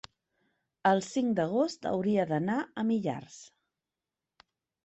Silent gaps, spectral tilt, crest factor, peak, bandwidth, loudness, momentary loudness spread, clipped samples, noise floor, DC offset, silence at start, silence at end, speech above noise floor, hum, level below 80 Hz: none; -6 dB/octave; 20 dB; -12 dBFS; 8.4 kHz; -30 LUFS; 9 LU; under 0.1%; -90 dBFS; under 0.1%; 0.85 s; 1.4 s; 60 dB; none; -72 dBFS